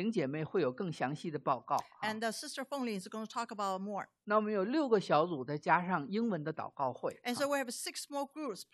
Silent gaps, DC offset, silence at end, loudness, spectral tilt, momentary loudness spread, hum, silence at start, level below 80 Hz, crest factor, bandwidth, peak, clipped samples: none; under 0.1%; 0.1 s; -36 LUFS; -5 dB/octave; 9 LU; none; 0 s; -84 dBFS; 22 dB; 13 kHz; -14 dBFS; under 0.1%